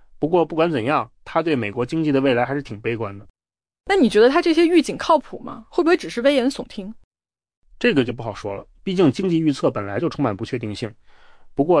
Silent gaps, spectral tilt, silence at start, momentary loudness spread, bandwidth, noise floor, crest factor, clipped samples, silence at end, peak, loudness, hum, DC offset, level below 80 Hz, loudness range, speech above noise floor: 3.30-3.34 s, 7.04-7.11 s, 7.57-7.62 s; -6 dB/octave; 0.2 s; 15 LU; 10.5 kHz; -44 dBFS; 16 dB; under 0.1%; 0 s; -6 dBFS; -20 LUFS; none; under 0.1%; -50 dBFS; 5 LU; 25 dB